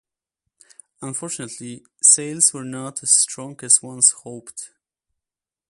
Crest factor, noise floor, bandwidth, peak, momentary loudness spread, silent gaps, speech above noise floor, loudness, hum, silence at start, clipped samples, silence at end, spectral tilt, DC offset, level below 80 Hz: 22 dB; -89 dBFS; 13 kHz; 0 dBFS; 21 LU; none; 68 dB; -16 LUFS; none; 1 s; under 0.1%; 1.05 s; -1.5 dB/octave; under 0.1%; -72 dBFS